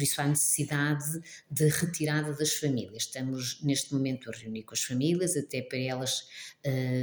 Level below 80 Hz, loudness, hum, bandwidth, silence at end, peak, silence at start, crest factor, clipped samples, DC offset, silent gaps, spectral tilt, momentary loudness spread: -70 dBFS; -30 LUFS; none; over 20 kHz; 0 s; -14 dBFS; 0 s; 16 dB; under 0.1%; under 0.1%; none; -4 dB/octave; 9 LU